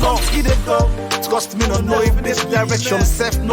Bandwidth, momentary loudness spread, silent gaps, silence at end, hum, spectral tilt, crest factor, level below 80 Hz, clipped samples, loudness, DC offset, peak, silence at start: 19.5 kHz; 3 LU; none; 0 s; none; -4.5 dB/octave; 12 dB; -20 dBFS; under 0.1%; -17 LUFS; under 0.1%; -4 dBFS; 0 s